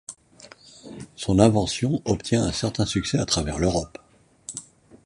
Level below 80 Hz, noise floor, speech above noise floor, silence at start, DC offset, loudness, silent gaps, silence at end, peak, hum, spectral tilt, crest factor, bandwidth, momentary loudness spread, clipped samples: -42 dBFS; -50 dBFS; 27 dB; 0.1 s; under 0.1%; -23 LUFS; none; 0.1 s; -2 dBFS; none; -5 dB/octave; 22 dB; 11.5 kHz; 22 LU; under 0.1%